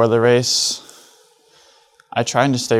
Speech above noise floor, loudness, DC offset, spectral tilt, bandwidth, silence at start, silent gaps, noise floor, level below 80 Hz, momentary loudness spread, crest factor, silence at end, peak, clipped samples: 37 dB; -17 LUFS; under 0.1%; -3.5 dB/octave; 15.5 kHz; 0 s; none; -53 dBFS; -64 dBFS; 11 LU; 18 dB; 0 s; 0 dBFS; under 0.1%